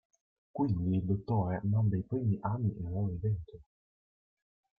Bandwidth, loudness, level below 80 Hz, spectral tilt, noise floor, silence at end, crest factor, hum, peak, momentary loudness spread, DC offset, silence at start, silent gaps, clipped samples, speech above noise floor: 4.8 kHz; -33 LUFS; -58 dBFS; -12 dB/octave; under -90 dBFS; 1.15 s; 14 dB; none; -18 dBFS; 5 LU; under 0.1%; 0.55 s; none; under 0.1%; over 58 dB